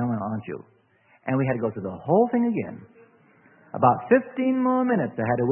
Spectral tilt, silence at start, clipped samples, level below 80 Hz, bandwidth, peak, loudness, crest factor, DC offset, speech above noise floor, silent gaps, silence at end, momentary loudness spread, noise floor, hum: -12.5 dB/octave; 0 s; under 0.1%; -64 dBFS; 3.2 kHz; -4 dBFS; -24 LUFS; 22 dB; under 0.1%; 33 dB; none; 0 s; 16 LU; -57 dBFS; none